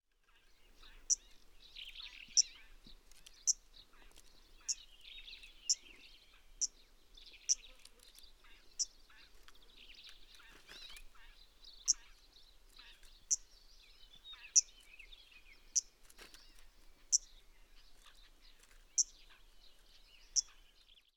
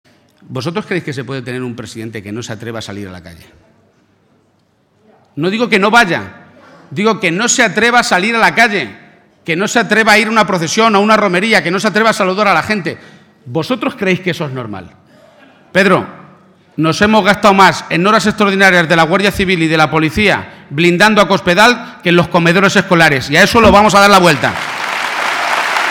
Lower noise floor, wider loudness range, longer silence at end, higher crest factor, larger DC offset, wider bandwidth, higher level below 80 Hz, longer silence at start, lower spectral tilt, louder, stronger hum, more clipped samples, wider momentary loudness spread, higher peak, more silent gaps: first, -69 dBFS vs -56 dBFS; second, 6 LU vs 14 LU; first, 0.65 s vs 0 s; first, 30 dB vs 12 dB; neither; about the same, 19.5 kHz vs 18.5 kHz; second, -64 dBFS vs -40 dBFS; first, 0.8 s vs 0.5 s; second, 3.5 dB/octave vs -4 dB/octave; second, -36 LUFS vs -11 LUFS; neither; second, under 0.1% vs 0.3%; first, 27 LU vs 16 LU; second, -14 dBFS vs 0 dBFS; neither